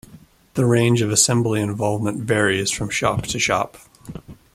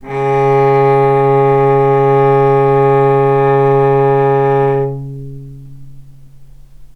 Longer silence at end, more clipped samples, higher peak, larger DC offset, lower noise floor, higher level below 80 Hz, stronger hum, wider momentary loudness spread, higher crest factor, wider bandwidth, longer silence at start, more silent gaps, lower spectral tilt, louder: about the same, 0.2 s vs 0.1 s; neither; about the same, -2 dBFS vs 0 dBFS; neither; first, -48 dBFS vs -35 dBFS; second, -48 dBFS vs -42 dBFS; neither; first, 16 LU vs 9 LU; first, 18 dB vs 12 dB; first, 15.5 kHz vs 5.8 kHz; about the same, 0.1 s vs 0.05 s; neither; second, -4 dB/octave vs -9.5 dB/octave; second, -19 LUFS vs -11 LUFS